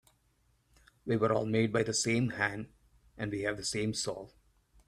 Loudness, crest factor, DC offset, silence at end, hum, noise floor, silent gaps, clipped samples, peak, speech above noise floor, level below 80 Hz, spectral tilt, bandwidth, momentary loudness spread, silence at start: -32 LUFS; 20 dB; under 0.1%; 0.6 s; none; -72 dBFS; none; under 0.1%; -14 dBFS; 40 dB; -64 dBFS; -4.5 dB/octave; 14 kHz; 16 LU; 1.05 s